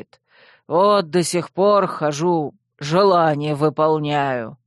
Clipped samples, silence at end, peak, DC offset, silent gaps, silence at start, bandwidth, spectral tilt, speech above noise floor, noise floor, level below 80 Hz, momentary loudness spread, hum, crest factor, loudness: under 0.1%; 0.1 s; -4 dBFS; under 0.1%; none; 0.7 s; 12.5 kHz; -5.5 dB/octave; 35 dB; -53 dBFS; -64 dBFS; 7 LU; none; 16 dB; -18 LUFS